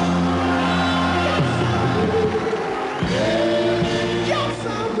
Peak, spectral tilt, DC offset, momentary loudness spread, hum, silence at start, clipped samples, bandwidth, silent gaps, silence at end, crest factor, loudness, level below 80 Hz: -8 dBFS; -6 dB/octave; under 0.1%; 5 LU; none; 0 s; under 0.1%; 11.5 kHz; none; 0 s; 12 dB; -20 LUFS; -44 dBFS